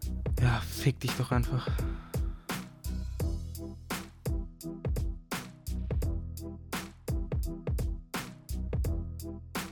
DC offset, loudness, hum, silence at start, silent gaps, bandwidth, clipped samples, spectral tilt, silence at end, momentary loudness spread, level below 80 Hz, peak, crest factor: under 0.1%; -35 LUFS; none; 0 s; none; 18 kHz; under 0.1%; -5.5 dB/octave; 0 s; 10 LU; -38 dBFS; -14 dBFS; 20 dB